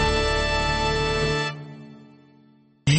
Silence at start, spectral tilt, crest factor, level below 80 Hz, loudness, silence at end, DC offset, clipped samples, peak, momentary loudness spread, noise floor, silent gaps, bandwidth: 0 s; -4.5 dB/octave; 16 dB; -34 dBFS; -23 LUFS; 0 s; under 0.1%; under 0.1%; -8 dBFS; 17 LU; -56 dBFS; none; 8.8 kHz